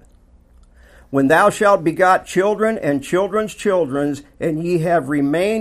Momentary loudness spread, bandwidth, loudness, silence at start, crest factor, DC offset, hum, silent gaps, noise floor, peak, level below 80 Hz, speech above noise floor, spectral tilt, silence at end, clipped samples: 9 LU; 15 kHz; -17 LUFS; 1.1 s; 16 dB; under 0.1%; 60 Hz at -50 dBFS; none; -50 dBFS; 0 dBFS; -50 dBFS; 33 dB; -6 dB/octave; 0 s; under 0.1%